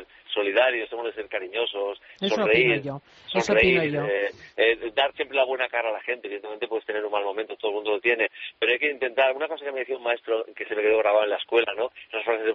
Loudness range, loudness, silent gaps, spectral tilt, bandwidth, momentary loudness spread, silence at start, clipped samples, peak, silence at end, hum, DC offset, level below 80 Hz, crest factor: 4 LU; -25 LUFS; none; -2 dB/octave; 7.6 kHz; 11 LU; 0 s; under 0.1%; -6 dBFS; 0 s; none; under 0.1%; -58 dBFS; 18 dB